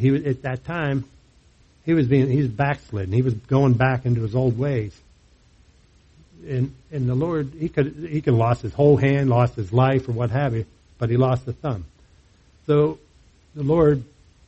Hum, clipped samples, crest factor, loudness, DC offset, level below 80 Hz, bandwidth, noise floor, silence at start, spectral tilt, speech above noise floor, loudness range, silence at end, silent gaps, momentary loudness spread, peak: none; under 0.1%; 18 dB; -22 LUFS; under 0.1%; -48 dBFS; 7.8 kHz; -55 dBFS; 0 s; -9 dB/octave; 35 dB; 6 LU; 0.45 s; none; 11 LU; -4 dBFS